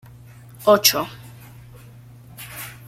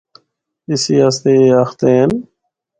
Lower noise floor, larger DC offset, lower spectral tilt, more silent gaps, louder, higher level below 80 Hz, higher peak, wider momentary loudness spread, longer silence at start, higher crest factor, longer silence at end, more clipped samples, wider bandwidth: second, -44 dBFS vs -64 dBFS; neither; second, -2.5 dB/octave vs -5.5 dB/octave; neither; second, -17 LUFS vs -13 LUFS; about the same, -56 dBFS vs -54 dBFS; about the same, 0 dBFS vs 0 dBFS; first, 26 LU vs 9 LU; about the same, 0.6 s vs 0.7 s; first, 24 dB vs 14 dB; second, 0.15 s vs 0.55 s; neither; first, 16.5 kHz vs 9.2 kHz